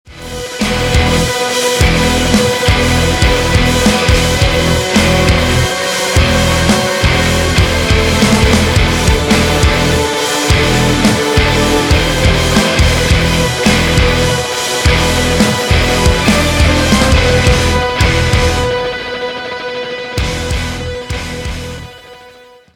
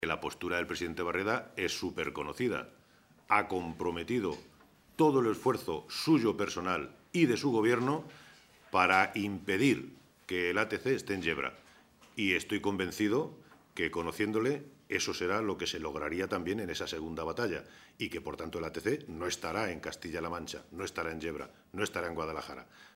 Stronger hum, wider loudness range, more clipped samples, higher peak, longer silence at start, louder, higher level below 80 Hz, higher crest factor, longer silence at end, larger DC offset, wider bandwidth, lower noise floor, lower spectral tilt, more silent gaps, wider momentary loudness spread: neither; second, 4 LU vs 7 LU; neither; first, 0 dBFS vs -10 dBFS; about the same, 0.1 s vs 0 s; first, -11 LUFS vs -33 LUFS; first, -20 dBFS vs -62 dBFS; second, 12 dB vs 24 dB; first, 0.45 s vs 0.1 s; neither; first, 18.5 kHz vs 16 kHz; second, -39 dBFS vs -60 dBFS; about the same, -4.5 dB/octave vs -4.5 dB/octave; neither; about the same, 10 LU vs 12 LU